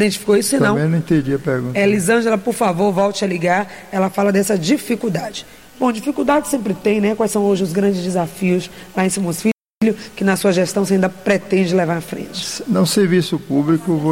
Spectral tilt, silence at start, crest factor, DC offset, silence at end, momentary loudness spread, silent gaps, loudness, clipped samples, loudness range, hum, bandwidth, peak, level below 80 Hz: -5.5 dB/octave; 0 s; 12 dB; 0.3%; 0 s; 6 LU; 9.53-9.58 s, 9.70-9.81 s; -17 LUFS; under 0.1%; 2 LU; none; 16.5 kHz; -4 dBFS; -52 dBFS